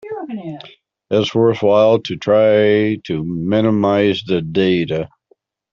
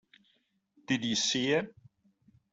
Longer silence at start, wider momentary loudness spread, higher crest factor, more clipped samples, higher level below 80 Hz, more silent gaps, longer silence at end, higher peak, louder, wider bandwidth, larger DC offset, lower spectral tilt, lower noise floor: second, 0.05 s vs 0.9 s; first, 15 LU vs 6 LU; second, 14 dB vs 20 dB; neither; first, -54 dBFS vs -74 dBFS; neither; second, 0.65 s vs 0.8 s; first, -2 dBFS vs -14 dBFS; first, -16 LUFS vs -30 LUFS; second, 7.2 kHz vs 8.2 kHz; neither; first, -7 dB/octave vs -3 dB/octave; second, -59 dBFS vs -74 dBFS